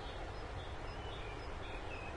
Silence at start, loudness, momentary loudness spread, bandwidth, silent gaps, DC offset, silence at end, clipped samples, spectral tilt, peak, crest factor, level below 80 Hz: 0 s; -46 LUFS; 1 LU; 11 kHz; none; under 0.1%; 0 s; under 0.1%; -5.5 dB/octave; -32 dBFS; 14 dB; -50 dBFS